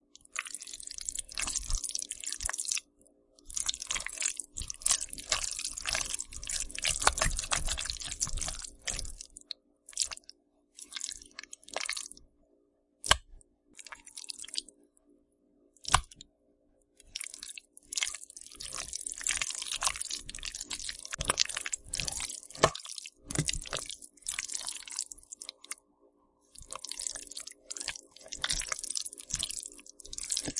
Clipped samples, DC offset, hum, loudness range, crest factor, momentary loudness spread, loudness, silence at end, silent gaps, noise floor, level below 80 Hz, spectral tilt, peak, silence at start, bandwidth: under 0.1%; under 0.1%; none; 7 LU; 36 dB; 15 LU; -34 LUFS; 0 s; none; -71 dBFS; -48 dBFS; -0.5 dB/octave; -2 dBFS; 0.35 s; 11.5 kHz